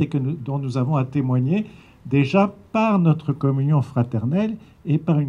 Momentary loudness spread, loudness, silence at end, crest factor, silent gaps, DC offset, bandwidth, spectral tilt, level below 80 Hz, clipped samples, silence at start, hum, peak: 7 LU; -21 LUFS; 0 s; 16 dB; none; under 0.1%; 7.2 kHz; -9 dB/octave; -56 dBFS; under 0.1%; 0 s; none; -4 dBFS